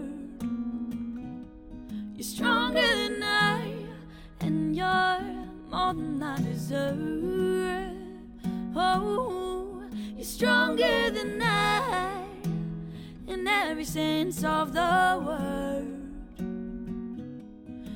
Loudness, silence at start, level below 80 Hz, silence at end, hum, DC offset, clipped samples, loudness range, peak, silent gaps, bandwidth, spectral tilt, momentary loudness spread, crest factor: -28 LUFS; 0 s; -50 dBFS; 0 s; none; under 0.1%; under 0.1%; 4 LU; -12 dBFS; none; 17.5 kHz; -4.5 dB/octave; 17 LU; 18 dB